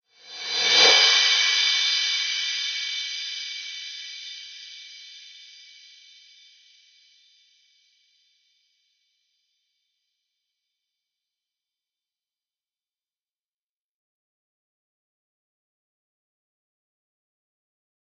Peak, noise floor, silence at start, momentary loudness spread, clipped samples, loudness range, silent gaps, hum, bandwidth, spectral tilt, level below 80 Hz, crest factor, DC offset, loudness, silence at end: -2 dBFS; under -90 dBFS; 0.25 s; 26 LU; under 0.1%; 25 LU; none; none; 8.6 kHz; 3 dB/octave; -84 dBFS; 26 dB; under 0.1%; -19 LUFS; 12.55 s